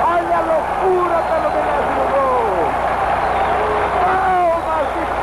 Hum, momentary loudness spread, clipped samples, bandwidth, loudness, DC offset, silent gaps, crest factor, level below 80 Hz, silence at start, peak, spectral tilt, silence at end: 60 Hz at -35 dBFS; 2 LU; under 0.1%; 13.5 kHz; -17 LUFS; under 0.1%; none; 10 dB; -36 dBFS; 0 s; -6 dBFS; -6 dB/octave; 0 s